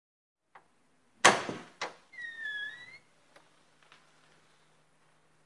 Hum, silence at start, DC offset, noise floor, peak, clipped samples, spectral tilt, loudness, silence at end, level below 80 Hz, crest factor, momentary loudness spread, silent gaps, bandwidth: none; 1.25 s; under 0.1%; -71 dBFS; -4 dBFS; under 0.1%; -1.5 dB/octave; -30 LUFS; 2.5 s; -80 dBFS; 34 dB; 20 LU; none; 11.5 kHz